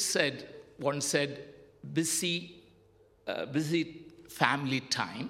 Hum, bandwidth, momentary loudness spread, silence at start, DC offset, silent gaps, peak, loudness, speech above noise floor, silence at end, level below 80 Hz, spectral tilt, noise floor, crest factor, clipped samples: none; 16 kHz; 20 LU; 0 s; under 0.1%; none; -6 dBFS; -31 LUFS; 31 dB; 0 s; -72 dBFS; -3 dB/octave; -63 dBFS; 28 dB; under 0.1%